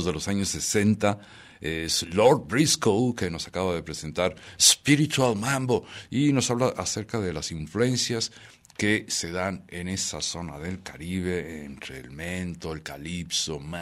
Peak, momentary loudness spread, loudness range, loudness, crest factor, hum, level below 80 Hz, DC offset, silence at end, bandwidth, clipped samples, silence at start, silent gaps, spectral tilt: -4 dBFS; 15 LU; 9 LU; -25 LUFS; 22 dB; none; -52 dBFS; under 0.1%; 0 s; 16 kHz; under 0.1%; 0 s; none; -3.5 dB/octave